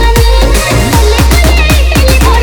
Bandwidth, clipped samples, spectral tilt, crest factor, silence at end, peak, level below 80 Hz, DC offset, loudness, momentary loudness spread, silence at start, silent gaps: over 20 kHz; 1%; -4.5 dB/octave; 6 dB; 0 s; 0 dBFS; -8 dBFS; under 0.1%; -7 LUFS; 2 LU; 0 s; none